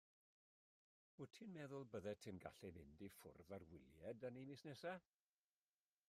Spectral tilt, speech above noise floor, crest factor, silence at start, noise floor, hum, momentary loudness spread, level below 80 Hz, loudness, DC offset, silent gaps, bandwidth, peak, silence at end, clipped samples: -6 dB/octave; over 34 dB; 20 dB; 1.2 s; under -90 dBFS; none; 8 LU; -84 dBFS; -57 LUFS; under 0.1%; none; 15 kHz; -38 dBFS; 1.1 s; under 0.1%